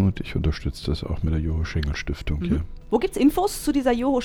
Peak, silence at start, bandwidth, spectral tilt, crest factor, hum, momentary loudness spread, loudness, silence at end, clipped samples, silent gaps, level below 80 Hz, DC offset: -6 dBFS; 0 s; 18.5 kHz; -6.5 dB/octave; 16 dB; none; 8 LU; -24 LUFS; 0 s; under 0.1%; none; -30 dBFS; under 0.1%